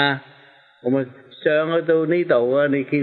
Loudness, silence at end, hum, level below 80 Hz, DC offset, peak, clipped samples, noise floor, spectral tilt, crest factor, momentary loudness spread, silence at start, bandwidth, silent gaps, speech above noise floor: -20 LUFS; 0 s; none; -72 dBFS; under 0.1%; -4 dBFS; under 0.1%; -51 dBFS; -9.5 dB/octave; 16 dB; 10 LU; 0 s; 4.5 kHz; none; 32 dB